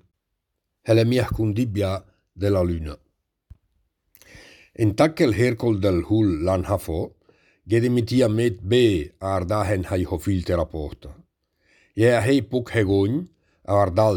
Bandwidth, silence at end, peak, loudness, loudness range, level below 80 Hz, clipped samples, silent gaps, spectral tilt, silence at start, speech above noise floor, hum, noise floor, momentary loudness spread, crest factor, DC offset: 19 kHz; 0 s; -4 dBFS; -22 LUFS; 4 LU; -42 dBFS; under 0.1%; none; -7 dB/octave; 0.85 s; 58 dB; none; -78 dBFS; 12 LU; 18 dB; under 0.1%